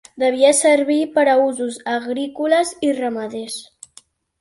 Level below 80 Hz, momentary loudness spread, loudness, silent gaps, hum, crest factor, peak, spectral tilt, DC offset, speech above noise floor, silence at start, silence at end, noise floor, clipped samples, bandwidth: -66 dBFS; 13 LU; -18 LUFS; none; none; 16 dB; -2 dBFS; -2 dB/octave; under 0.1%; 33 dB; 0.15 s; 0.75 s; -50 dBFS; under 0.1%; 12 kHz